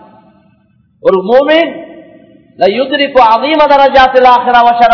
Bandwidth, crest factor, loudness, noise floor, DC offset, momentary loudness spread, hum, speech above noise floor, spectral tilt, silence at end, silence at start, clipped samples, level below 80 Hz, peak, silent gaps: 5.4 kHz; 8 dB; -8 LUFS; -50 dBFS; under 0.1%; 7 LU; none; 44 dB; -5.5 dB/octave; 0 s; 1.05 s; 5%; -40 dBFS; 0 dBFS; none